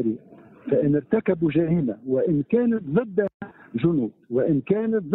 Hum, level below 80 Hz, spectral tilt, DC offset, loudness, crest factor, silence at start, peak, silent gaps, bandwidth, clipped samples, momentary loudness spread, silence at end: none; -56 dBFS; -12.5 dB/octave; under 0.1%; -23 LUFS; 16 dB; 0 s; -8 dBFS; 3.34-3.40 s; 4.1 kHz; under 0.1%; 7 LU; 0 s